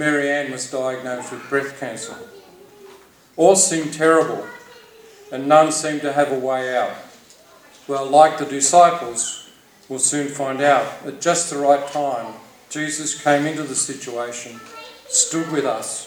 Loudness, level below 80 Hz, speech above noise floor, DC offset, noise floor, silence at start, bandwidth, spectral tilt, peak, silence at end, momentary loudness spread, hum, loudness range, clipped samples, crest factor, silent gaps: -19 LUFS; -70 dBFS; 29 dB; under 0.1%; -48 dBFS; 0 s; over 20 kHz; -3 dB/octave; 0 dBFS; 0 s; 18 LU; none; 4 LU; under 0.1%; 20 dB; none